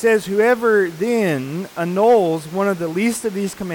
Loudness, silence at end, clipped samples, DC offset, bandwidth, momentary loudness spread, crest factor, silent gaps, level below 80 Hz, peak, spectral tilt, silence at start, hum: -18 LUFS; 0 s; under 0.1%; under 0.1%; 19 kHz; 9 LU; 12 dB; none; -58 dBFS; -6 dBFS; -5.5 dB/octave; 0 s; none